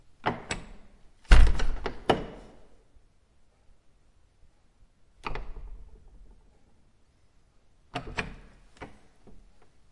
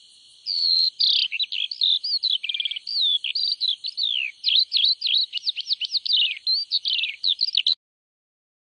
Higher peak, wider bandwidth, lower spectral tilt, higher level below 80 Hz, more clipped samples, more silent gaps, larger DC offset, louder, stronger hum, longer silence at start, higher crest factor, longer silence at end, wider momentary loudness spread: first, -2 dBFS vs -8 dBFS; about the same, 11 kHz vs 10.5 kHz; first, -5.5 dB/octave vs 5 dB/octave; first, -30 dBFS vs -88 dBFS; neither; neither; neither; second, -30 LUFS vs -20 LUFS; neither; second, 0.25 s vs 0.45 s; first, 26 dB vs 16 dB; about the same, 1.05 s vs 1.05 s; first, 27 LU vs 7 LU